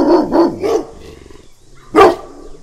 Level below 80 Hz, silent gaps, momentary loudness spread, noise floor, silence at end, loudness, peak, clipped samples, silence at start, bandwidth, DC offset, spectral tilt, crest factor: -38 dBFS; none; 13 LU; -40 dBFS; 0.05 s; -12 LUFS; 0 dBFS; 0.1%; 0 s; 14 kHz; under 0.1%; -5.5 dB/octave; 14 dB